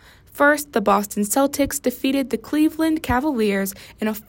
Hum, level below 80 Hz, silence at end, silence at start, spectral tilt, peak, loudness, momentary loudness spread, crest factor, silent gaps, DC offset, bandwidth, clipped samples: none; -44 dBFS; 0.1 s; 0.35 s; -4 dB/octave; -4 dBFS; -20 LUFS; 6 LU; 16 dB; none; under 0.1%; 16.5 kHz; under 0.1%